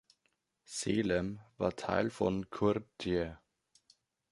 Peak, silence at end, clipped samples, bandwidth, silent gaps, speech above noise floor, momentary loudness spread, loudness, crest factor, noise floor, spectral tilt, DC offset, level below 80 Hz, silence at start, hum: -14 dBFS; 0.95 s; under 0.1%; 11.5 kHz; none; 46 dB; 8 LU; -35 LUFS; 22 dB; -80 dBFS; -5.5 dB/octave; under 0.1%; -58 dBFS; 0.7 s; none